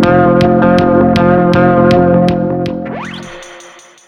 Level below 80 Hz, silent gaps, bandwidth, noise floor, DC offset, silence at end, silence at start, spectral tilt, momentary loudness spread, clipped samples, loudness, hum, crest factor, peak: -36 dBFS; none; 9.4 kHz; -37 dBFS; under 0.1%; 0.45 s; 0 s; -8 dB/octave; 16 LU; under 0.1%; -10 LUFS; none; 10 dB; 0 dBFS